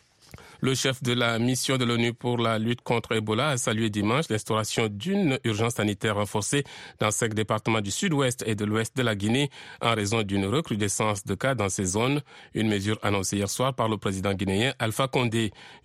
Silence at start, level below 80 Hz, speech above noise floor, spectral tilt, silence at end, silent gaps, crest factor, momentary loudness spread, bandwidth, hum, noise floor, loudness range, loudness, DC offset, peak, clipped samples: 0.35 s; -60 dBFS; 24 dB; -4.5 dB/octave; 0.1 s; none; 18 dB; 3 LU; 15.5 kHz; none; -50 dBFS; 1 LU; -26 LUFS; under 0.1%; -8 dBFS; under 0.1%